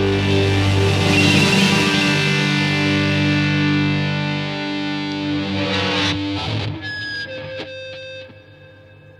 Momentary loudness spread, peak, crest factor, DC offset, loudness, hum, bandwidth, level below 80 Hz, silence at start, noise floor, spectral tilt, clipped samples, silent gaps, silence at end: 15 LU; -2 dBFS; 16 dB; under 0.1%; -18 LUFS; 50 Hz at -50 dBFS; 14 kHz; -46 dBFS; 0 s; -44 dBFS; -5 dB/octave; under 0.1%; none; 0.1 s